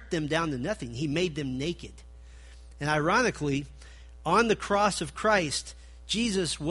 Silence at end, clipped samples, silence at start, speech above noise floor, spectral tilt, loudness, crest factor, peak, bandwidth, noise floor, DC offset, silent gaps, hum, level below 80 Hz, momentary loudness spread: 0 s; under 0.1%; 0 s; 20 dB; -4.5 dB/octave; -28 LUFS; 20 dB; -10 dBFS; 11.5 kHz; -48 dBFS; under 0.1%; none; none; -48 dBFS; 11 LU